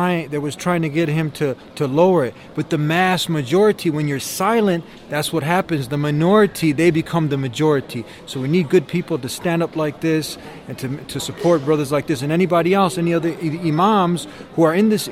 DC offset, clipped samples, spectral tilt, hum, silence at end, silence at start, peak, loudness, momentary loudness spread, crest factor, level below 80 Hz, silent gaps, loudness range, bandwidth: under 0.1%; under 0.1%; -6 dB/octave; none; 0 s; 0 s; -2 dBFS; -19 LUFS; 11 LU; 16 dB; -54 dBFS; none; 3 LU; 16.5 kHz